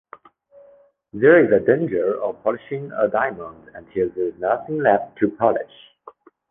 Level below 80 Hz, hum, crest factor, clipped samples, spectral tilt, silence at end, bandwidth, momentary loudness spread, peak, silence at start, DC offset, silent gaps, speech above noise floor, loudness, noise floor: -58 dBFS; none; 18 dB; under 0.1%; -10 dB/octave; 0.4 s; 3.7 kHz; 15 LU; -2 dBFS; 1.15 s; under 0.1%; none; 33 dB; -20 LUFS; -53 dBFS